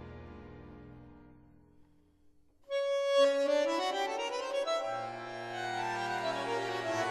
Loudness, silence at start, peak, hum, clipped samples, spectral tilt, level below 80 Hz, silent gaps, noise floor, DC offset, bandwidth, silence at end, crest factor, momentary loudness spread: -33 LUFS; 0 s; -16 dBFS; none; under 0.1%; -3.5 dB/octave; -66 dBFS; none; -64 dBFS; under 0.1%; 12.5 kHz; 0 s; 18 dB; 23 LU